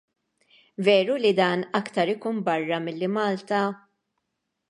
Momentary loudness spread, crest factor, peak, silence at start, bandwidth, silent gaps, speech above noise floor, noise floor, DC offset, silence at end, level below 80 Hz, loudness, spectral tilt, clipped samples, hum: 8 LU; 20 dB; -6 dBFS; 0.8 s; 11.5 kHz; none; 56 dB; -80 dBFS; under 0.1%; 0.95 s; -78 dBFS; -24 LUFS; -6 dB/octave; under 0.1%; none